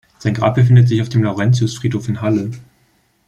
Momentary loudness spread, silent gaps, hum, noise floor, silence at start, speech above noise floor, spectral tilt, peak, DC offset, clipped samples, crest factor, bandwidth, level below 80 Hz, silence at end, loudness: 10 LU; none; none; -58 dBFS; 0.25 s; 44 dB; -7.5 dB/octave; -2 dBFS; under 0.1%; under 0.1%; 14 dB; 8.8 kHz; -50 dBFS; 0.65 s; -15 LUFS